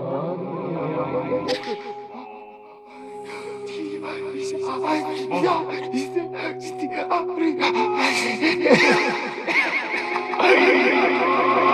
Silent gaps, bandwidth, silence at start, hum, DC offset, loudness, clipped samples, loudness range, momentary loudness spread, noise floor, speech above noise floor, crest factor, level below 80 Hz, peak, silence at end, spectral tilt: none; 12.5 kHz; 0 s; none; under 0.1%; -21 LUFS; under 0.1%; 12 LU; 18 LU; -43 dBFS; 22 dB; 22 dB; -70 dBFS; -2 dBFS; 0 s; -4.5 dB/octave